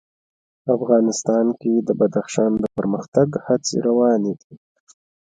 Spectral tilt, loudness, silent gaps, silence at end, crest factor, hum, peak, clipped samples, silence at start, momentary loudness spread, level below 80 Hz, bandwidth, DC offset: -6 dB/octave; -20 LUFS; 3.08-3.12 s, 4.44-4.50 s; 0.65 s; 18 dB; none; -2 dBFS; under 0.1%; 0.65 s; 6 LU; -58 dBFS; 9.4 kHz; under 0.1%